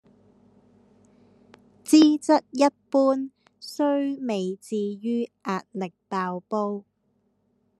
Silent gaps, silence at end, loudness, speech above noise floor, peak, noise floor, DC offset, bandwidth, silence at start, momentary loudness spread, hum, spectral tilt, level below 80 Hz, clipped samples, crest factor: none; 1 s; -24 LUFS; 47 dB; -4 dBFS; -70 dBFS; under 0.1%; 12.5 kHz; 1.85 s; 16 LU; none; -5 dB/octave; -80 dBFS; under 0.1%; 22 dB